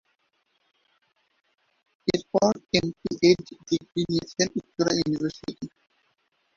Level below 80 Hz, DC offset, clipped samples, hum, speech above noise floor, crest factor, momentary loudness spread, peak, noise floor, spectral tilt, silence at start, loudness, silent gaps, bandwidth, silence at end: -58 dBFS; under 0.1%; under 0.1%; none; 47 dB; 22 dB; 11 LU; -4 dBFS; -72 dBFS; -4.5 dB/octave; 2.05 s; -26 LUFS; none; 7.4 kHz; 0.9 s